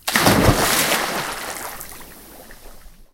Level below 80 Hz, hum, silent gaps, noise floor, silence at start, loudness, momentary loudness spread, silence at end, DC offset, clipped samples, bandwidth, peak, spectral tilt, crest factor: -36 dBFS; none; none; -41 dBFS; 0.05 s; -18 LUFS; 23 LU; 0.1 s; under 0.1%; under 0.1%; 17 kHz; 0 dBFS; -3.5 dB/octave; 22 dB